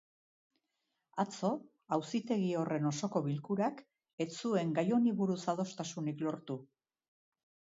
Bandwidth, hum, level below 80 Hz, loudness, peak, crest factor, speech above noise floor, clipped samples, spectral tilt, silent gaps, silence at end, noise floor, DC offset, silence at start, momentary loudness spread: 7.6 kHz; none; -82 dBFS; -36 LUFS; -18 dBFS; 18 dB; 51 dB; under 0.1%; -6.5 dB/octave; 4.13-4.18 s; 1.1 s; -85 dBFS; under 0.1%; 1.15 s; 10 LU